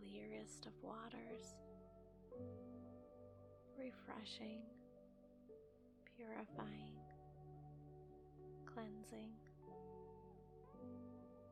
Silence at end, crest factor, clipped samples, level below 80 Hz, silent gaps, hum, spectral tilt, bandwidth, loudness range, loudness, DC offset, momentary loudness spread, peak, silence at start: 0 s; 24 dB; under 0.1%; -74 dBFS; none; none; -5.5 dB/octave; 10 kHz; 2 LU; -57 LUFS; under 0.1%; 11 LU; -34 dBFS; 0 s